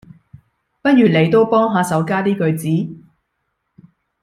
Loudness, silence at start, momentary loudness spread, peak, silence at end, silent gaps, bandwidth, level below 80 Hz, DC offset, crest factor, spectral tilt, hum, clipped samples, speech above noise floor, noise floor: -15 LUFS; 0.85 s; 9 LU; -2 dBFS; 1.25 s; none; 15 kHz; -58 dBFS; under 0.1%; 16 dB; -7 dB/octave; none; under 0.1%; 57 dB; -72 dBFS